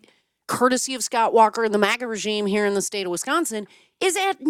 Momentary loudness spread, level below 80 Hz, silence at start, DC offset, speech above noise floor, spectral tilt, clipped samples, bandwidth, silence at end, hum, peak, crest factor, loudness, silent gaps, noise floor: 8 LU; -70 dBFS; 0.5 s; under 0.1%; 23 dB; -3 dB/octave; under 0.1%; 17 kHz; 0 s; none; -2 dBFS; 20 dB; -21 LUFS; none; -45 dBFS